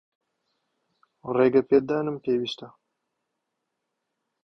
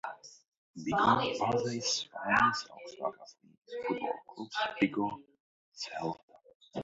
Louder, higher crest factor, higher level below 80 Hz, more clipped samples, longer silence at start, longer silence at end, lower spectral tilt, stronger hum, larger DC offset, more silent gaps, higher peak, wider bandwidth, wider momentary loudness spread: first, -24 LUFS vs -32 LUFS; about the same, 20 dB vs 22 dB; about the same, -66 dBFS vs -68 dBFS; neither; first, 1.25 s vs 0.05 s; first, 1.75 s vs 0 s; first, -7 dB/octave vs -2.5 dB/octave; neither; neither; second, none vs 0.57-0.74 s, 3.57-3.61 s, 5.40-5.72 s, 6.23-6.28 s, 6.55-6.60 s; first, -8 dBFS vs -12 dBFS; second, 6.4 kHz vs 7.6 kHz; second, 15 LU vs 18 LU